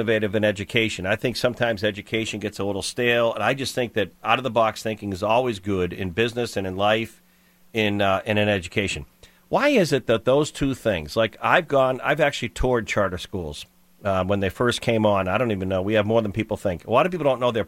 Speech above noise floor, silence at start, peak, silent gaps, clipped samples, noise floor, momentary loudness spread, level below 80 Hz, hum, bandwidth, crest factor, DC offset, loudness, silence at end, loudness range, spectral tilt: 34 dB; 0 s; -2 dBFS; none; under 0.1%; -57 dBFS; 7 LU; -46 dBFS; none; 16.5 kHz; 22 dB; under 0.1%; -23 LUFS; 0 s; 2 LU; -5 dB/octave